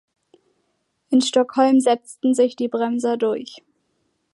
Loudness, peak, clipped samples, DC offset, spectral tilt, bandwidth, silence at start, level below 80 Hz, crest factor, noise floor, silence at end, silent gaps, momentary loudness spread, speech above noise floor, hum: -20 LUFS; -4 dBFS; under 0.1%; under 0.1%; -3.5 dB/octave; 11.5 kHz; 1.1 s; -76 dBFS; 18 dB; -71 dBFS; 0.75 s; none; 7 LU; 52 dB; none